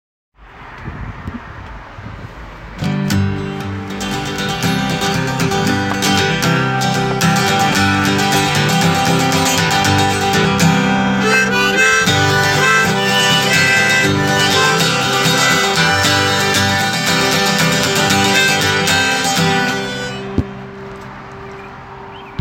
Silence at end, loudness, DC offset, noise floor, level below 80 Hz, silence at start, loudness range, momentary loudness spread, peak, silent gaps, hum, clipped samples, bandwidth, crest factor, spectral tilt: 0 s; -13 LUFS; under 0.1%; -35 dBFS; -40 dBFS; 0.4 s; 9 LU; 20 LU; 0 dBFS; none; none; under 0.1%; 17 kHz; 16 dB; -3.5 dB/octave